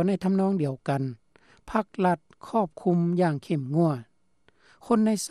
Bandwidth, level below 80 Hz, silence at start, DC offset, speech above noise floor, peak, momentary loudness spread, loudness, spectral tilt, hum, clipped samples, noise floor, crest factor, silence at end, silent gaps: 13 kHz; -62 dBFS; 0 s; under 0.1%; 42 dB; -10 dBFS; 7 LU; -26 LUFS; -7 dB/octave; none; under 0.1%; -67 dBFS; 16 dB; 0 s; none